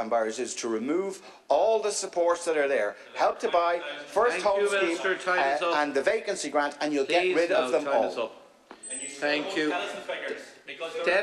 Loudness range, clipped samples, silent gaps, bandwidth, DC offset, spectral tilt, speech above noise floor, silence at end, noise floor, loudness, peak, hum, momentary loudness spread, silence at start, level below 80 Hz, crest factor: 3 LU; under 0.1%; none; 12.5 kHz; under 0.1%; -2.5 dB/octave; 20 dB; 0 s; -47 dBFS; -27 LUFS; -10 dBFS; none; 10 LU; 0 s; -68 dBFS; 16 dB